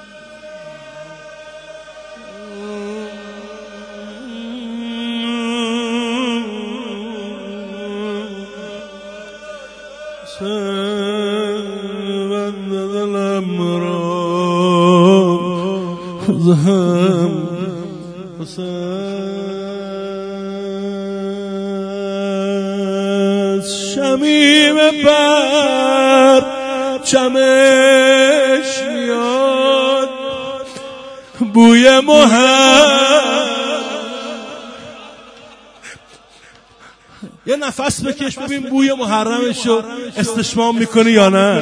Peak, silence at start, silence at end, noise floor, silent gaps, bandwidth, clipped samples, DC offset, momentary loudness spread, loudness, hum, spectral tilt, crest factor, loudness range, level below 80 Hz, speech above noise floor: 0 dBFS; 0 s; 0 s; -45 dBFS; none; 11 kHz; under 0.1%; under 0.1%; 24 LU; -14 LUFS; none; -4.5 dB/octave; 16 dB; 17 LU; -54 dBFS; 33 dB